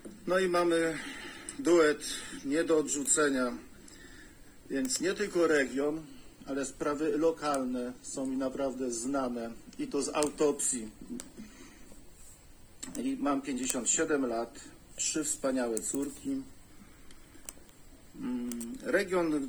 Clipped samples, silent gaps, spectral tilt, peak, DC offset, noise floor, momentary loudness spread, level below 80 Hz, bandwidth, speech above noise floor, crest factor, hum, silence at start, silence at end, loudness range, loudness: under 0.1%; none; -3 dB/octave; -8 dBFS; under 0.1%; -54 dBFS; 20 LU; -58 dBFS; over 20 kHz; 22 dB; 24 dB; none; 0 s; 0 s; 6 LU; -31 LUFS